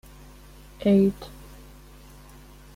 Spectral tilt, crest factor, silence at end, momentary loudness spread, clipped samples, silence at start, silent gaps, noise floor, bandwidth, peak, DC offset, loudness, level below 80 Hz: -8 dB/octave; 18 dB; 1.45 s; 26 LU; under 0.1%; 0.8 s; none; -48 dBFS; 15.5 kHz; -10 dBFS; under 0.1%; -22 LUFS; -48 dBFS